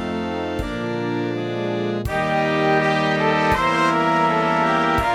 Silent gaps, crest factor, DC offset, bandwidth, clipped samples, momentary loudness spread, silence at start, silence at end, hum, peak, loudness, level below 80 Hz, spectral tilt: none; 14 dB; under 0.1%; 17 kHz; under 0.1%; 7 LU; 0 s; 0 s; none; -6 dBFS; -20 LUFS; -40 dBFS; -6 dB/octave